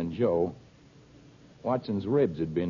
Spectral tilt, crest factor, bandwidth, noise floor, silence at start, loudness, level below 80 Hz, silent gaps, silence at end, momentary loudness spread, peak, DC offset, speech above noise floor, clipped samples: -9.5 dB/octave; 16 dB; 7.2 kHz; -55 dBFS; 0 s; -29 LUFS; -58 dBFS; none; 0 s; 6 LU; -14 dBFS; under 0.1%; 27 dB; under 0.1%